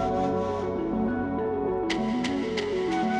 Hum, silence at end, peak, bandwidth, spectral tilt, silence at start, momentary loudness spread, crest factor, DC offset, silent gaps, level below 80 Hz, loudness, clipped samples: none; 0 s; -12 dBFS; 10.5 kHz; -6 dB/octave; 0 s; 2 LU; 14 dB; under 0.1%; none; -48 dBFS; -28 LUFS; under 0.1%